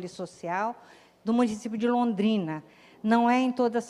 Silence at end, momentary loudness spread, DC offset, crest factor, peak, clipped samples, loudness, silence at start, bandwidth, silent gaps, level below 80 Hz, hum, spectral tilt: 0 s; 14 LU; under 0.1%; 18 dB; -10 dBFS; under 0.1%; -27 LUFS; 0 s; 11 kHz; none; -70 dBFS; none; -6 dB/octave